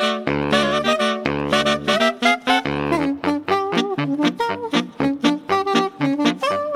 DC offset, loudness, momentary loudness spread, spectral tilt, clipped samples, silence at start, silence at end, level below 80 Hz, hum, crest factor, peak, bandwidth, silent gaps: under 0.1%; -20 LUFS; 5 LU; -4.5 dB/octave; under 0.1%; 0 s; 0 s; -48 dBFS; none; 16 dB; -2 dBFS; 15.5 kHz; none